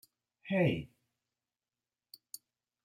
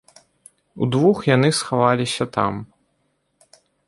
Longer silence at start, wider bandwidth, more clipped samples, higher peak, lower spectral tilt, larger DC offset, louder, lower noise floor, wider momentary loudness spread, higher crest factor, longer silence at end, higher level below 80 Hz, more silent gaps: second, 0.45 s vs 0.75 s; first, 16 kHz vs 11.5 kHz; neither; second, -18 dBFS vs -2 dBFS; about the same, -6.5 dB/octave vs -5.5 dB/octave; neither; second, -33 LUFS vs -19 LUFS; first, under -90 dBFS vs -69 dBFS; first, 22 LU vs 8 LU; about the same, 22 dB vs 20 dB; first, 2 s vs 1.25 s; second, -70 dBFS vs -58 dBFS; neither